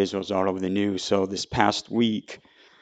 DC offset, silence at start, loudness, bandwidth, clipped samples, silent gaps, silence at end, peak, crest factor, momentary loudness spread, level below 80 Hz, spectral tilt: under 0.1%; 0 s; -25 LUFS; 9.2 kHz; under 0.1%; none; 0.45 s; 0 dBFS; 24 dB; 8 LU; -56 dBFS; -5 dB/octave